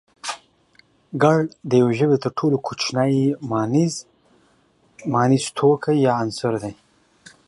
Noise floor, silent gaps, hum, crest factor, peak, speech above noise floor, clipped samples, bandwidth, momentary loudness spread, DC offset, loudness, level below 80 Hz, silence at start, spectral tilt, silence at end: -60 dBFS; none; none; 18 dB; -2 dBFS; 40 dB; under 0.1%; 11.5 kHz; 14 LU; under 0.1%; -20 LUFS; -62 dBFS; 0.25 s; -6 dB/octave; 0.75 s